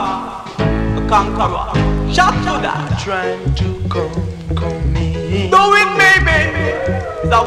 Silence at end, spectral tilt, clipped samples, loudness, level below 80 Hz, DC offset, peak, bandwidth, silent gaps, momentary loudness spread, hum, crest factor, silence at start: 0 s; -5.5 dB/octave; under 0.1%; -15 LUFS; -24 dBFS; under 0.1%; 0 dBFS; 15 kHz; none; 11 LU; none; 14 dB; 0 s